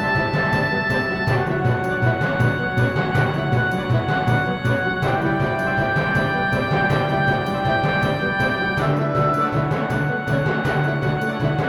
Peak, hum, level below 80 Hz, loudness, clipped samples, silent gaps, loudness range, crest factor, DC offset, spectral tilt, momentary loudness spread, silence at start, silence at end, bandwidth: -6 dBFS; none; -42 dBFS; -20 LUFS; under 0.1%; none; 1 LU; 14 dB; under 0.1%; -7 dB/octave; 2 LU; 0 s; 0 s; 12.5 kHz